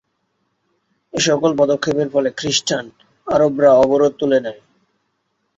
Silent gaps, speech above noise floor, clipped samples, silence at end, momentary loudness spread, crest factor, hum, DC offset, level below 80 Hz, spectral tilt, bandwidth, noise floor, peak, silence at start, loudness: none; 54 dB; under 0.1%; 1.05 s; 11 LU; 16 dB; none; under 0.1%; -54 dBFS; -4 dB/octave; 8 kHz; -70 dBFS; -2 dBFS; 1.15 s; -16 LUFS